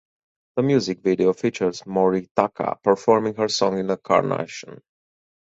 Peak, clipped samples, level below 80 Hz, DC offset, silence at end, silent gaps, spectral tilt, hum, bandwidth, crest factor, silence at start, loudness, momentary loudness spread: -2 dBFS; under 0.1%; -60 dBFS; under 0.1%; 0.7 s; 2.31-2.35 s; -5.5 dB/octave; none; 8 kHz; 20 dB; 0.55 s; -22 LUFS; 6 LU